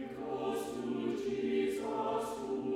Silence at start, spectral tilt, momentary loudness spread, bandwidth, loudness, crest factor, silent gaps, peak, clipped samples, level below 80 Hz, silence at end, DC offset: 0 s; -5.5 dB/octave; 5 LU; 15.5 kHz; -36 LUFS; 14 dB; none; -22 dBFS; under 0.1%; -68 dBFS; 0 s; under 0.1%